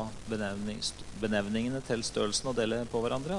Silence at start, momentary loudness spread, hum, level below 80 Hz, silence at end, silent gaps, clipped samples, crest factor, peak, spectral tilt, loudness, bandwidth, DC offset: 0 s; 6 LU; none; -52 dBFS; 0 s; none; under 0.1%; 18 dB; -16 dBFS; -4 dB/octave; -33 LUFS; 11.5 kHz; under 0.1%